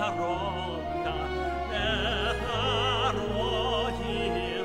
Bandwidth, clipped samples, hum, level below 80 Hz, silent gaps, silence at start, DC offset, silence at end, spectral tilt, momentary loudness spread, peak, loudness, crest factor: 16 kHz; under 0.1%; none; -40 dBFS; none; 0 s; 0.2%; 0 s; -5 dB/octave; 5 LU; -14 dBFS; -29 LUFS; 14 dB